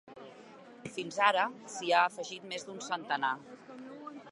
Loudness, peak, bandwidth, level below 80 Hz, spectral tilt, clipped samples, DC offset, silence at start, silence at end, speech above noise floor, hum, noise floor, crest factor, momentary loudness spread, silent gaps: -32 LUFS; -10 dBFS; 11.5 kHz; -82 dBFS; -2.5 dB/octave; under 0.1%; under 0.1%; 0.05 s; 0 s; 21 dB; none; -53 dBFS; 24 dB; 23 LU; none